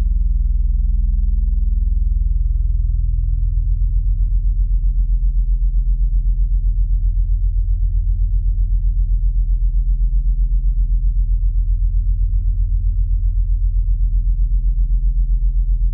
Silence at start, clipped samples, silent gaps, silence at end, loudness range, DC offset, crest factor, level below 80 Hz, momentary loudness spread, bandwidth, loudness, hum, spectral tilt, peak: 0 s; under 0.1%; none; 0 s; 0 LU; under 0.1%; 8 dB; -16 dBFS; 1 LU; 0.3 kHz; -21 LUFS; none; -24.5 dB/octave; -8 dBFS